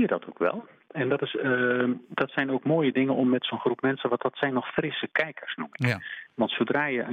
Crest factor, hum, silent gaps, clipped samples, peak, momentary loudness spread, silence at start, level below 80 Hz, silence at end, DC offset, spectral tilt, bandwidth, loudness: 18 dB; none; none; under 0.1%; -8 dBFS; 7 LU; 0 s; -72 dBFS; 0 s; under 0.1%; -7.5 dB/octave; 8.8 kHz; -27 LUFS